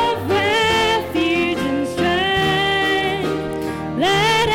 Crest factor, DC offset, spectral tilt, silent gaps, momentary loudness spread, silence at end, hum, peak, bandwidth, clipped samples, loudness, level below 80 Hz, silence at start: 10 dB; under 0.1%; -4.5 dB/octave; none; 7 LU; 0 s; none; -8 dBFS; 17 kHz; under 0.1%; -18 LUFS; -42 dBFS; 0 s